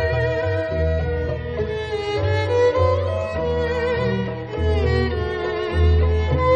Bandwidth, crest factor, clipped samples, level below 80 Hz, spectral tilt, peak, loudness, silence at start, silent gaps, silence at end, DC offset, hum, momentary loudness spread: 7.4 kHz; 14 dB; under 0.1%; -28 dBFS; -7.5 dB/octave; -6 dBFS; -21 LUFS; 0 s; none; 0 s; under 0.1%; none; 7 LU